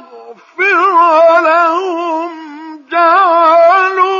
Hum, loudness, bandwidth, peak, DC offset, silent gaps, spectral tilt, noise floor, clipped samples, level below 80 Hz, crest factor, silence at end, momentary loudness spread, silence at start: none; -9 LUFS; 7.2 kHz; 0 dBFS; under 0.1%; none; -2 dB/octave; -35 dBFS; under 0.1%; -82 dBFS; 10 dB; 0 s; 19 LU; 0.15 s